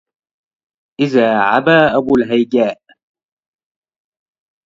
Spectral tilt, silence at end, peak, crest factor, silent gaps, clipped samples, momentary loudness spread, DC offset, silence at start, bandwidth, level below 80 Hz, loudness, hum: -7 dB/octave; 1.95 s; 0 dBFS; 16 dB; none; under 0.1%; 6 LU; under 0.1%; 1 s; 7.6 kHz; -54 dBFS; -13 LUFS; none